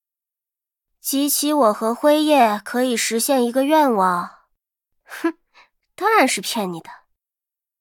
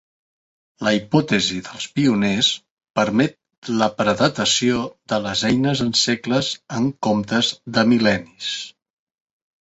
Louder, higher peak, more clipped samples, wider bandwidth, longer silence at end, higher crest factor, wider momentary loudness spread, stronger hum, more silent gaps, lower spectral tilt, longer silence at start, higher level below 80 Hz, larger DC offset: about the same, -18 LUFS vs -20 LUFS; about the same, -4 dBFS vs -2 dBFS; neither; first, 19 kHz vs 8.2 kHz; about the same, 0.85 s vs 0.95 s; about the same, 16 dB vs 18 dB; about the same, 11 LU vs 9 LU; neither; second, none vs 2.71-2.77 s, 2.90-2.94 s, 3.58-3.62 s; about the same, -3 dB/octave vs -4 dB/octave; first, 1.05 s vs 0.8 s; second, -76 dBFS vs -54 dBFS; neither